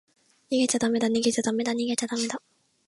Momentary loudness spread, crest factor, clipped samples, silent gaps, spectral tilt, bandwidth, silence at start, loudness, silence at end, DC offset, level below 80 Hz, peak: 6 LU; 16 dB; under 0.1%; none; -3 dB/octave; 11.5 kHz; 0.5 s; -26 LUFS; 0.5 s; under 0.1%; -68 dBFS; -12 dBFS